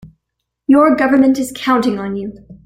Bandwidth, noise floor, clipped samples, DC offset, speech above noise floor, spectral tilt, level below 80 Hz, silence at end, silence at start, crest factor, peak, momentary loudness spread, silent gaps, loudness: 15.5 kHz; -76 dBFS; under 0.1%; under 0.1%; 62 dB; -5.5 dB/octave; -50 dBFS; 0.1 s; 0.05 s; 14 dB; 0 dBFS; 15 LU; none; -14 LUFS